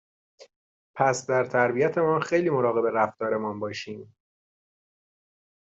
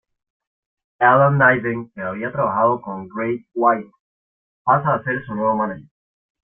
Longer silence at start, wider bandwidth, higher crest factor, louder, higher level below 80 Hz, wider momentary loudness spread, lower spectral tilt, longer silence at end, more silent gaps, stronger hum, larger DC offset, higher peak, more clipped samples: second, 0.4 s vs 1 s; first, 8.2 kHz vs 3.6 kHz; about the same, 20 dB vs 20 dB; second, -25 LUFS vs -19 LUFS; second, -70 dBFS vs -60 dBFS; about the same, 12 LU vs 13 LU; second, -5.5 dB/octave vs -11.5 dB/octave; first, 1.7 s vs 0.65 s; second, 0.56-0.94 s vs 4.00-4.65 s; neither; neither; second, -6 dBFS vs -2 dBFS; neither